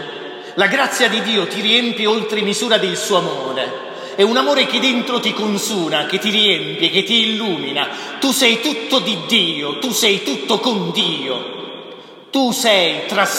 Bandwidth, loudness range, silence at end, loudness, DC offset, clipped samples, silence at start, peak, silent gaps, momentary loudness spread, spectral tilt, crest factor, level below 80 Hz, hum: 16.5 kHz; 2 LU; 0 s; -16 LUFS; under 0.1%; under 0.1%; 0 s; 0 dBFS; none; 10 LU; -2.5 dB/octave; 16 dB; -72 dBFS; none